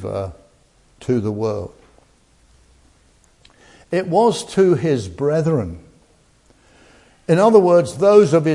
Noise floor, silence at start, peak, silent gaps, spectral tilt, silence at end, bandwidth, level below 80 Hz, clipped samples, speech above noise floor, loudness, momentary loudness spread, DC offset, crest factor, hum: -55 dBFS; 0 s; 0 dBFS; none; -7 dB/octave; 0 s; 11.5 kHz; -54 dBFS; under 0.1%; 39 dB; -17 LUFS; 19 LU; under 0.1%; 18 dB; none